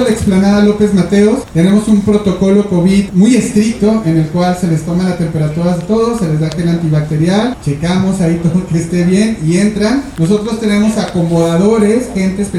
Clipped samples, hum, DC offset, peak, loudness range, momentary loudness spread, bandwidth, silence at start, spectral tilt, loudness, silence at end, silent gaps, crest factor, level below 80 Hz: under 0.1%; none; under 0.1%; 0 dBFS; 3 LU; 5 LU; 12.5 kHz; 0 s; -7 dB/octave; -12 LUFS; 0 s; none; 10 dB; -34 dBFS